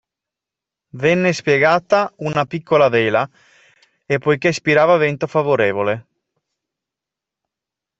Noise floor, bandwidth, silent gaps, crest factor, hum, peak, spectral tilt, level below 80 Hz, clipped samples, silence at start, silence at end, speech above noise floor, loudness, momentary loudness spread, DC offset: -86 dBFS; 8.2 kHz; none; 16 dB; none; -2 dBFS; -6 dB/octave; -58 dBFS; under 0.1%; 0.95 s; 2 s; 70 dB; -17 LUFS; 7 LU; under 0.1%